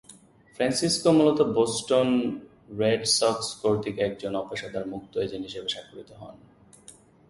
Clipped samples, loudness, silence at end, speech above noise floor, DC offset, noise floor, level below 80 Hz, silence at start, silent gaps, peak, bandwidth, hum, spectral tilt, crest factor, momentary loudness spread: under 0.1%; -25 LUFS; 0.95 s; 28 dB; under 0.1%; -53 dBFS; -60 dBFS; 0.1 s; none; -8 dBFS; 11.5 kHz; none; -4 dB/octave; 18 dB; 16 LU